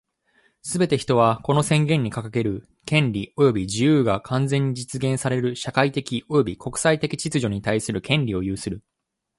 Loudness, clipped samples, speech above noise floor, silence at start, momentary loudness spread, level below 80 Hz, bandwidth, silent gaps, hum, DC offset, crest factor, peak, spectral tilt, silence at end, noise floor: -22 LUFS; under 0.1%; 42 dB; 0.65 s; 8 LU; -50 dBFS; 11.5 kHz; none; none; under 0.1%; 18 dB; -4 dBFS; -5.5 dB/octave; 0.6 s; -64 dBFS